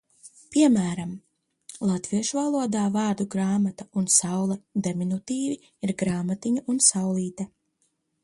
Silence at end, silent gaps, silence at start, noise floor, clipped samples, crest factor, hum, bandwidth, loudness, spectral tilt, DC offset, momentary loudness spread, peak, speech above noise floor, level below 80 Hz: 0.75 s; none; 0.25 s; -73 dBFS; under 0.1%; 22 dB; none; 11.5 kHz; -25 LUFS; -4.5 dB/octave; under 0.1%; 11 LU; -4 dBFS; 48 dB; -64 dBFS